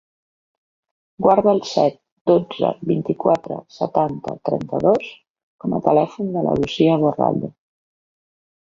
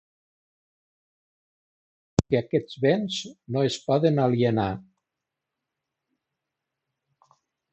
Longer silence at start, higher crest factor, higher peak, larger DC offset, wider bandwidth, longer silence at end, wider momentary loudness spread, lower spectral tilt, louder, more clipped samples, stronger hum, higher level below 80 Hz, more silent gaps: second, 1.2 s vs 2.2 s; second, 20 dB vs 28 dB; about the same, 0 dBFS vs -2 dBFS; neither; second, 7.6 kHz vs 8.4 kHz; second, 1.15 s vs 2.9 s; about the same, 10 LU vs 9 LU; about the same, -7.5 dB/octave vs -6.5 dB/octave; first, -19 LUFS vs -25 LUFS; neither; neither; about the same, -54 dBFS vs -52 dBFS; first, 2.12-2.25 s, 5.30-5.34 s, 5.43-5.59 s vs none